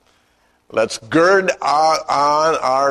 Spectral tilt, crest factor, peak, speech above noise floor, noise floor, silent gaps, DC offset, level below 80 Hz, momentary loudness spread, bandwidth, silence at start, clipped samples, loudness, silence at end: -3.5 dB/octave; 14 dB; -2 dBFS; 44 dB; -59 dBFS; none; under 0.1%; -56 dBFS; 7 LU; 13 kHz; 0.75 s; under 0.1%; -16 LUFS; 0 s